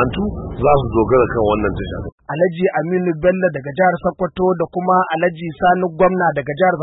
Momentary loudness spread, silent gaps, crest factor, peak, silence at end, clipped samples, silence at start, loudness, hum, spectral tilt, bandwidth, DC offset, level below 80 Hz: 7 LU; 2.12-2.18 s; 14 dB; -2 dBFS; 0 s; under 0.1%; 0 s; -17 LUFS; none; -12.5 dB/octave; 4 kHz; under 0.1%; -36 dBFS